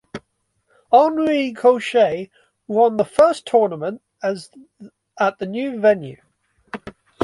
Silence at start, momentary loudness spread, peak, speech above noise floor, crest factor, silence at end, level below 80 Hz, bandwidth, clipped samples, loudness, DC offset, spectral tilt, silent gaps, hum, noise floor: 0.15 s; 20 LU; -2 dBFS; 51 dB; 18 dB; 0 s; -62 dBFS; 11.5 kHz; under 0.1%; -18 LUFS; under 0.1%; -5.5 dB/octave; none; none; -68 dBFS